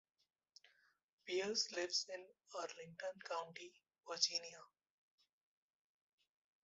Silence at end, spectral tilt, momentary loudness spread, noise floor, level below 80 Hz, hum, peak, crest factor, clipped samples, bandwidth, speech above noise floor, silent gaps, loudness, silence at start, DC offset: 2 s; 0 dB/octave; 19 LU; -76 dBFS; under -90 dBFS; none; -22 dBFS; 26 dB; under 0.1%; 8 kHz; 31 dB; none; -43 LUFS; 1.25 s; under 0.1%